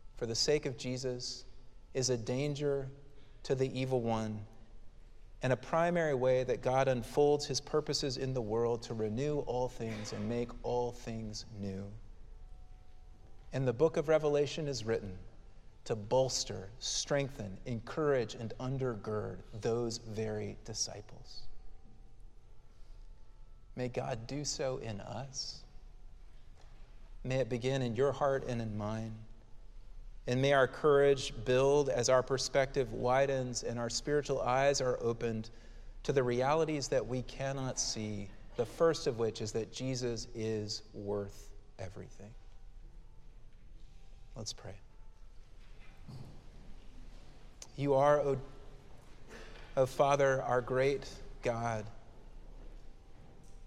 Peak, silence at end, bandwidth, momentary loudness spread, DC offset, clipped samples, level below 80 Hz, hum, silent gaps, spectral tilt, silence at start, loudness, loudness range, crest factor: -16 dBFS; 0 s; 13.5 kHz; 18 LU; under 0.1%; under 0.1%; -52 dBFS; none; none; -4.5 dB/octave; 0 s; -34 LUFS; 14 LU; 20 dB